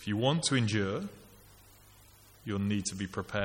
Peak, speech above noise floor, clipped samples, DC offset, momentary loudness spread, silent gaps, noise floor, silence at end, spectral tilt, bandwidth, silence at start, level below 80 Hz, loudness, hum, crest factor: -14 dBFS; 27 dB; under 0.1%; under 0.1%; 10 LU; none; -58 dBFS; 0 s; -4.5 dB/octave; 17 kHz; 0 s; -62 dBFS; -32 LUFS; 50 Hz at -55 dBFS; 20 dB